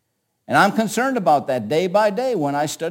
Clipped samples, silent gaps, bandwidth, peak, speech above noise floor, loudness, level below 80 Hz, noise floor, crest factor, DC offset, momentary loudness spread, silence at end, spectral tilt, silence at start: under 0.1%; none; 17 kHz; -2 dBFS; 29 dB; -19 LUFS; -68 dBFS; -47 dBFS; 18 dB; under 0.1%; 5 LU; 0 s; -5 dB/octave; 0.5 s